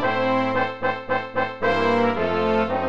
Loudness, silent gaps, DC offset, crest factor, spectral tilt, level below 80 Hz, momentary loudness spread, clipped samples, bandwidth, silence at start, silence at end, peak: -22 LUFS; none; 1%; 14 dB; -6.5 dB/octave; -52 dBFS; 5 LU; under 0.1%; 7.8 kHz; 0 s; 0 s; -8 dBFS